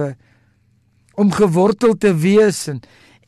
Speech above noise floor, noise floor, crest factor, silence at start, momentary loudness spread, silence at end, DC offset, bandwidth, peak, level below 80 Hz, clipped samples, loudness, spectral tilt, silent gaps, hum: 43 dB; -58 dBFS; 12 dB; 0 s; 14 LU; 0.45 s; under 0.1%; 13 kHz; -4 dBFS; -52 dBFS; under 0.1%; -15 LUFS; -6.5 dB/octave; none; none